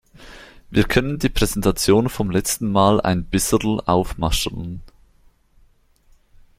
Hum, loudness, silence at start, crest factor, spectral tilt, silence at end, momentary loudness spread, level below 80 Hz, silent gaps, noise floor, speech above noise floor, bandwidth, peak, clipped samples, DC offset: none; -19 LUFS; 0.2 s; 20 dB; -5 dB/octave; 1.7 s; 7 LU; -34 dBFS; none; -56 dBFS; 37 dB; 16.5 kHz; -2 dBFS; under 0.1%; under 0.1%